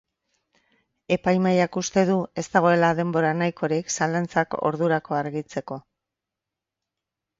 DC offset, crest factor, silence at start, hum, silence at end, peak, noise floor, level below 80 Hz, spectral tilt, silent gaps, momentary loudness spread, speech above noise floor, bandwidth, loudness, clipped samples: under 0.1%; 22 dB; 1.1 s; none; 1.6 s; -4 dBFS; -87 dBFS; -62 dBFS; -5.5 dB/octave; none; 10 LU; 64 dB; 7.8 kHz; -23 LUFS; under 0.1%